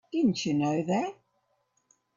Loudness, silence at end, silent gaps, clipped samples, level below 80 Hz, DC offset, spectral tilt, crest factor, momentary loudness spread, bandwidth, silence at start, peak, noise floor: -28 LUFS; 1.05 s; none; under 0.1%; -70 dBFS; under 0.1%; -6 dB/octave; 16 dB; 4 LU; 7.4 kHz; 0.15 s; -16 dBFS; -74 dBFS